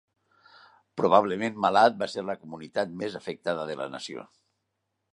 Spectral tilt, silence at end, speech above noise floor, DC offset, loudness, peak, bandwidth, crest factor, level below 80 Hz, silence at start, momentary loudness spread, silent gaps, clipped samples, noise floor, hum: -5 dB/octave; 0.9 s; 54 dB; under 0.1%; -27 LUFS; -4 dBFS; 11 kHz; 24 dB; -70 dBFS; 0.95 s; 16 LU; none; under 0.1%; -80 dBFS; none